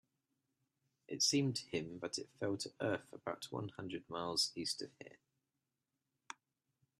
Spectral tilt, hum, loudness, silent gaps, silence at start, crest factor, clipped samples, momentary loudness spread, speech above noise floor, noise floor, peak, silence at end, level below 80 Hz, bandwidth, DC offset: -3.5 dB/octave; none; -39 LUFS; none; 1.1 s; 24 dB; under 0.1%; 21 LU; 49 dB; -89 dBFS; -20 dBFS; 1.85 s; -80 dBFS; 13.5 kHz; under 0.1%